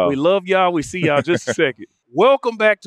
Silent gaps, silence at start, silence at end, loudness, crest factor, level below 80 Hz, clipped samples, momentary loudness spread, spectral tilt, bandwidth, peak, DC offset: none; 0 s; 0 s; -17 LUFS; 14 dB; -56 dBFS; under 0.1%; 5 LU; -5 dB/octave; 11.5 kHz; -2 dBFS; under 0.1%